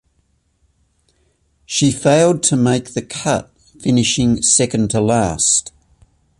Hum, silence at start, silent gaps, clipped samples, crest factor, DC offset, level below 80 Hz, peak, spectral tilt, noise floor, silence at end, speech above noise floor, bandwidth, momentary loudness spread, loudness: none; 1.7 s; none; under 0.1%; 18 dB; under 0.1%; -44 dBFS; 0 dBFS; -4 dB/octave; -62 dBFS; 0.7 s; 47 dB; 11.5 kHz; 9 LU; -15 LUFS